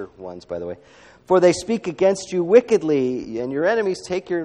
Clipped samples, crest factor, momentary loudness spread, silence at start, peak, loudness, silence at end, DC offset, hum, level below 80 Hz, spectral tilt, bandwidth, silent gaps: under 0.1%; 20 dB; 16 LU; 0 s; 0 dBFS; -20 LUFS; 0 s; under 0.1%; none; -58 dBFS; -5.5 dB/octave; 11 kHz; none